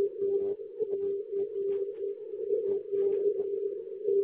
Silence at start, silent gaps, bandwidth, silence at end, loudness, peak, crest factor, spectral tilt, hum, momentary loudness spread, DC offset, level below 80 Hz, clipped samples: 0 s; none; 3.3 kHz; 0 s; -32 LUFS; -18 dBFS; 12 dB; -8.5 dB/octave; none; 6 LU; under 0.1%; -76 dBFS; under 0.1%